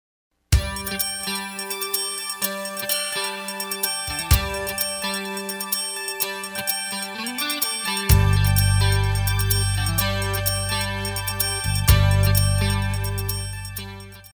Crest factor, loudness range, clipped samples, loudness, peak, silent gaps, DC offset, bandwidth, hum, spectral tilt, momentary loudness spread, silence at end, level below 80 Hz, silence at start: 22 dB; 4 LU; under 0.1%; -22 LUFS; 0 dBFS; none; under 0.1%; over 20 kHz; none; -3.5 dB/octave; 9 LU; 0.05 s; -30 dBFS; 0.5 s